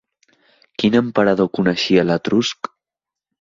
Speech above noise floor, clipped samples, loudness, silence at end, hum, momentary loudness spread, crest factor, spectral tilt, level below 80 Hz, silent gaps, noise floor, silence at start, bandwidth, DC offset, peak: 71 dB; under 0.1%; -17 LUFS; 0.9 s; none; 13 LU; 16 dB; -5.5 dB/octave; -54 dBFS; none; -87 dBFS; 0.8 s; 7.6 kHz; under 0.1%; -2 dBFS